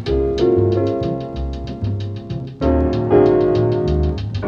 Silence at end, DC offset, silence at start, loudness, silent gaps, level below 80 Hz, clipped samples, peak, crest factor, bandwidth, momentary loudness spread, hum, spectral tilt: 0 s; under 0.1%; 0 s; -18 LUFS; none; -28 dBFS; under 0.1%; -2 dBFS; 16 dB; 6.8 kHz; 12 LU; none; -9 dB/octave